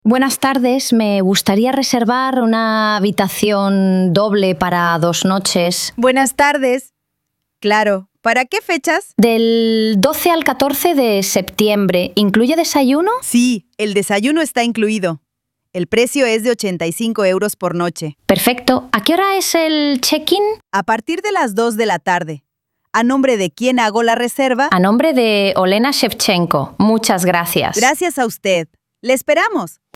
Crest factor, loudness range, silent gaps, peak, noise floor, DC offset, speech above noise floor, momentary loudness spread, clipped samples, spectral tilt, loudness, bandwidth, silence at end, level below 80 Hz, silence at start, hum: 14 dB; 3 LU; none; 0 dBFS; -76 dBFS; under 0.1%; 62 dB; 5 LU; under 0.1%; -4 dB/octave; -15 LUFS; 17 kHz; 0.25 s; -54 dBFS; 0.05 s; none